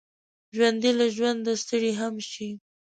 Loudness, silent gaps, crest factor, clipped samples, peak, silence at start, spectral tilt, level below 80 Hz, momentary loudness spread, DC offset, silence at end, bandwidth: -25 LUFS; none; 18 dB; under 0.1%; -10 dBFS; 0.55 s; -3.5 dB/octave; -74 dBFS; 14 LU; under 0.1%; 0.4 s; 9.2 kHz